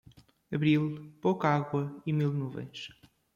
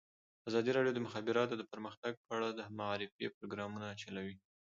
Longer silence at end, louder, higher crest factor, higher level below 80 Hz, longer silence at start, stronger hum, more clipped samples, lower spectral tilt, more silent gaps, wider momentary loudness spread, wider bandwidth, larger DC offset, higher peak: first, 0.45 s vs 0.3 s; first, -31 LUFS vs -40 LUFS; about the same, 18 dB vs 20 dB; first, -68 dBFS vs -76 dBFS; about the same, 0.5 s vs 0.45 s; neither; neither; first, -8 dB/octave vs -4 dB/octave; second, none vs 1.97-2.03 s, 2.17-2.24 s, 3.12-3.19 s, 3.34-3.41 s; first, 14 LU vs 11 LU; about the same, 7.2 kHz vs 7.4 kHz; neither; first, -12 dBFS vs -20 dBFS